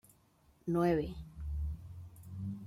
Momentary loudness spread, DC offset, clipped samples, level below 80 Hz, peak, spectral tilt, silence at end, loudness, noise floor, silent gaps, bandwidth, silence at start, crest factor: 18 LU; under 0.1%; under 0.1%; -48 dBFS; -20 dBFS; -8.5 dB/octave; 0 s; -37 LUFS; -68 dBFS; none; 15.5 kHz; 0.65 s; 18 dB